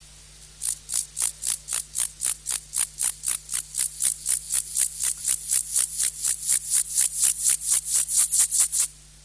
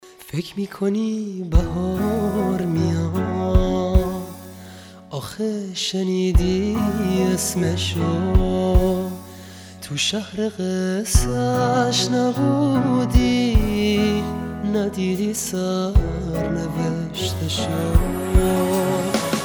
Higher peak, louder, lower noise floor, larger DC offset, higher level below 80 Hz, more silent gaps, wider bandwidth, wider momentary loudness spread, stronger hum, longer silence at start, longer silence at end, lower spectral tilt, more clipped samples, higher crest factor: second, -6 dBFS vs -2 dBFS; about the same, -22 LUFS vs -21 LUFS; first, -47 dBFS vs -40 dBFS; neither; second, -54 dBFS vs -26 dBFS; neither; second, 11 kHz vs over 20 kHz; second, 8 LU vs 11 LU; neither; about the same, 0 s vs 0.05 s; first, 0.25 s vs 0 s; second, 2.5 dB/octave vs -5.5 dB/octave; neither; about the same, 20 dB vs 18 dB